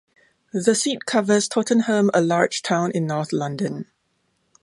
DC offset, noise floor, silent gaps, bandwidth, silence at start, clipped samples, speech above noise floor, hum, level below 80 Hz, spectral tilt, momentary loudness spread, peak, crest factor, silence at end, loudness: under 0.1%; -69 dBFS; none; 11.5 kHz; 0.55 s; under 0.1%; 49 dB; none; -68 dBFS; -4.5 dB/octave; 9 LU; -2 dBFS; 20 dB; 0.8 s; -21 LUFS